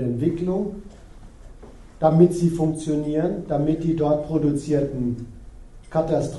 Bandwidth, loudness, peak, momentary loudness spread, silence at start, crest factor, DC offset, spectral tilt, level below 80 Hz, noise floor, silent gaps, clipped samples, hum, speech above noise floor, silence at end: 11.5 kHz; -22 LUFS; -2 dBFS; 10 LU; 0 s; 20 dB; under 0.1%; -8.5 dB/octave; -42 dBFS; -43 dBFS; none; under 0.1%; none; 22 dB; 0 s